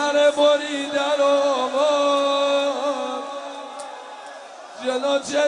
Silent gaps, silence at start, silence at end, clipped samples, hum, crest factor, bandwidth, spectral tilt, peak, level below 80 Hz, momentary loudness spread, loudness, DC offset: none; 0 s; 0 s; under 0.1%; none; 14 dB; 10.5 kHz; -1.5 dB/octave; -6 dBFS; -76 dBFS; 18 LU; -20 LUFS; under 0.1%